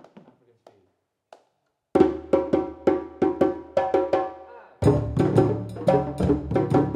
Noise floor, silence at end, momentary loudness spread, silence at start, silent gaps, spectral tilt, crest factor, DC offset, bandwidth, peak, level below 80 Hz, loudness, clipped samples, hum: -74 dBFS; 0 s; 5 LU; 0.15 s; none; -9 dB/octave; 20 dB; under 0.1%; 10 kHz; -4 dBFS; -44 dBFS; -23 LUFS; under 0.1%; none